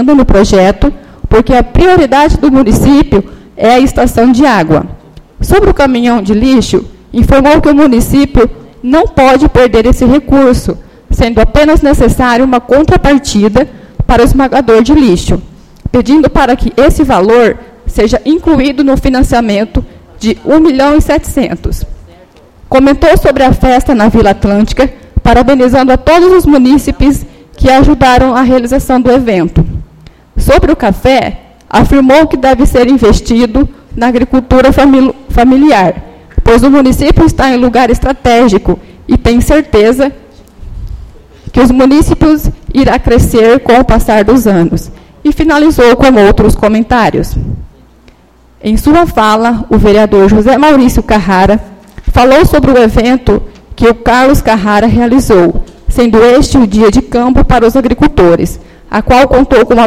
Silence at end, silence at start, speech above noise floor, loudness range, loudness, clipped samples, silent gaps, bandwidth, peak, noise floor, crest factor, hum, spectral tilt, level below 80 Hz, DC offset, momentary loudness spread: 0 s; 0 s; 36 dB; 3 LU; -7 LUFS; 3%; none; 15.5 kHz; 0 dBFS; -42 dBFS; 6 dB; none; -6.5 dB/octave; -16 dBFS; 1%; 9 LU